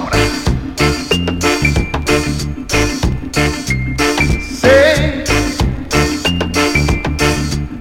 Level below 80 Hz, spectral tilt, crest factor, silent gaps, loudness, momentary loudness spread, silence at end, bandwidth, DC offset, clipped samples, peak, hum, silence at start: -22 dBFS; -4.5 dB/octave; 14 dB; none; -14 LUFS; 7 LU; 0 s; 17 kHz; under 0.1%; under 0.1%; 0 dBFS; none; 0 s